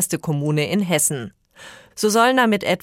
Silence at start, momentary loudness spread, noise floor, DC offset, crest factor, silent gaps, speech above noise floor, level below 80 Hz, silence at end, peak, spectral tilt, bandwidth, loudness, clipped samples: 0 s; 14 LU; -44 dBFS; under 0.1%; 16 dB; none; 25 dB; -62 dBFS; 0.05 s; -4 dBFS; -4 dB/octave; 16.5 kHz; -19 LUFS; under 0.1%